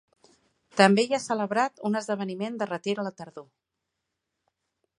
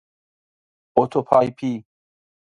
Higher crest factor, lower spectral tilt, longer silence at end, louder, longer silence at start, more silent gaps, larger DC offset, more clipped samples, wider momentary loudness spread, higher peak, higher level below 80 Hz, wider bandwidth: about the same, 26 dB vs 24 dB; second, -5 dB/octave vs -8 dB/octave; first, 1.55 s vs 0.7 s; second, -26 LUFS vs -20 LUFS; second, 0.75 s vs 0.95 s; neither; neither; neither; first, 14 LU vs 10 LU; about the same, -2 dBFS vs 0 dBFS; second, -78 dBFS vs -62 dBFS; about the same, 11 kHz vs 10.5 kHz